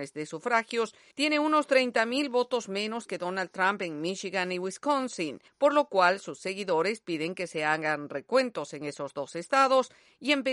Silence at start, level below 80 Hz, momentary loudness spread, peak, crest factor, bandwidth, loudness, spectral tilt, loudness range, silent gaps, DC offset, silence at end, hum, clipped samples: 0 s; -80 dBFS; 11 LU; -10 dBFS; 18 dB; 11.5 kHz; -28 LUFS; -4 dB/octave; 3 LU; none; under 0.1%; 0 s; none; under 0.1%